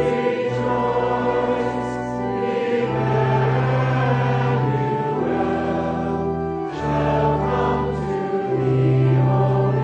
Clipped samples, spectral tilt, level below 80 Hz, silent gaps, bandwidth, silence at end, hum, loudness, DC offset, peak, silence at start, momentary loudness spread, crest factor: under 0.1%; -8.5 dB/octave; -42 dBFS; none; 7.6 kHz; 0 s; none; -21 LUFS; under 0.1%; -8 dBFS; 0 s; 6 LU; 12 dB